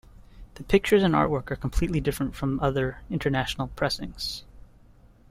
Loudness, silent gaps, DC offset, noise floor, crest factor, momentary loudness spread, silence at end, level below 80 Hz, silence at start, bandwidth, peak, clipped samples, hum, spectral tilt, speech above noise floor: -26 LUFS; none; under 0.1%; -54 dBFS; 20 dB; 11 LU; 0.65 s; -40 dBFS; 0.35 s; 16 kHz; -8 dBFS; under 0.1%; none; -6 dB/octave; 28 dB